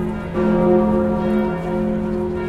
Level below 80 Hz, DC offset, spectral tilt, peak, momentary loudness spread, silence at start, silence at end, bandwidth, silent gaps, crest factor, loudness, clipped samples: -36 dBFS; under 0.1%; -9.5 dB/octave; -4 dBFS; 6 LU; 0 s; 0 s; 5.6 kHz; none; 14 dB; -19 LUFS; under 0.1%